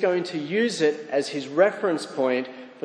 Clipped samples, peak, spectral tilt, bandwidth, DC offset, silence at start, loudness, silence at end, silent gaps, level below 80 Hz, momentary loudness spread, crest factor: under 0.1%; -6 dBFS; -4.5 dB/octave; 10.5 kHz; under 0.1%; 0 s; -24 LUFS; 0.05 s; none; -80 dBFS; 6 LU; 18 dB